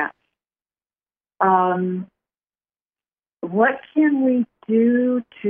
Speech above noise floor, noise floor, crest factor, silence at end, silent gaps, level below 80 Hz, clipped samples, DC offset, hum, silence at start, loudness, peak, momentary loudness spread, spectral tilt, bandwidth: over 72 dB; under -90 dBFS; 18 dB; 0 s; 2.85-2.90 s; -74 dBFS; under 0.1%; under 0.1%; none; 0 s; -19 LUFS; -4 dBFS; 11 LU; -11.5 dB/octave; 3.6 kHz